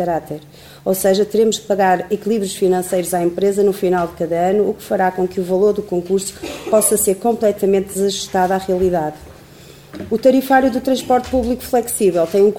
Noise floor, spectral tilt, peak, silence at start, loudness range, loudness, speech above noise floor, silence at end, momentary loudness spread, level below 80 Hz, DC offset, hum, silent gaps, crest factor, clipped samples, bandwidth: -41 dBFS; -4.5 dB/octave; 0 dBFS; 0 s; 1 LU; -17 LUFS; 25 dB; 0 s; 7 LU; -44 dBFS; 0.1%; none; none; 16 dB; under 0.1%; 19 kHz